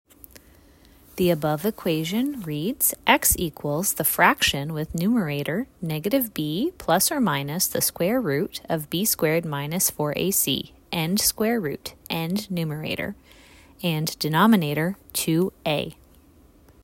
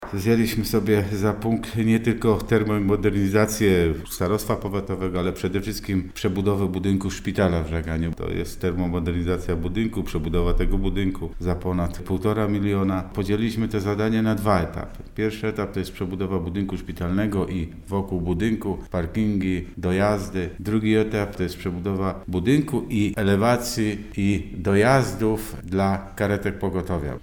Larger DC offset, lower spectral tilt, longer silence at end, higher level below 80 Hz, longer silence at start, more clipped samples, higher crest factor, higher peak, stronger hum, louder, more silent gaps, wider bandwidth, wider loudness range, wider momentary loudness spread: neither; second, -4 dB/octave vs -6.5 dB/octave; first, 0.9 s vs 0 s; second, -50 dBFS vs -36 dBFS; first, 1.15 s vs 0 s; neither; about the same, 22 dB vs 18 dB; about the same, -2 dBFS vs -4 dBFS; neither; about the same, -23 LUFS vs -24 LUFS; neither; second, 16.5 kHz vs over 20 kHz; about the same, 4 LU vs 4 LU; first, 10 LU vs 7 LU